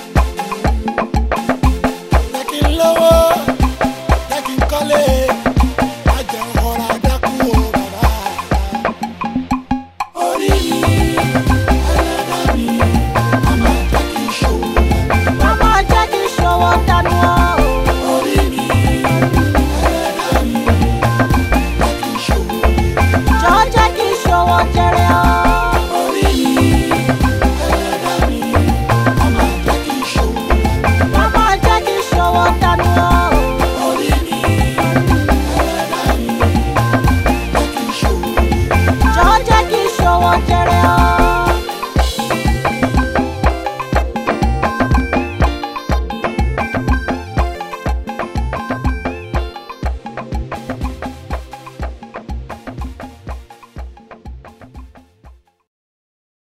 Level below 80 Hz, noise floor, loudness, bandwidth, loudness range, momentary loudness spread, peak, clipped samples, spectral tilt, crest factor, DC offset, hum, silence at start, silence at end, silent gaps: -20 dBFS; -44 dBFS; -14 LUFS; 16 kHz; 10 LU; 11 LU; 0 dBFS; under 0.1%; -5.5 dB/octave; 14 dB; under 0.1%; none; 0 s; 1.1 s; none